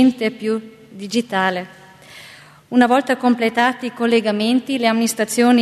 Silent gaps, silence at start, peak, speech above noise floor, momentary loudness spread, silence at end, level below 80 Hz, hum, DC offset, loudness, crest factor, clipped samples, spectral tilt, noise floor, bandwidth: none; 0 s; -2 dBFS; 26 dB; 15 LU; 0 s; -66 dBFS; none; under 0.1%; -18 LUFS; 16 dB; under 0.1%; -4 dB/octave; -43 dBFS; 13.5 kHz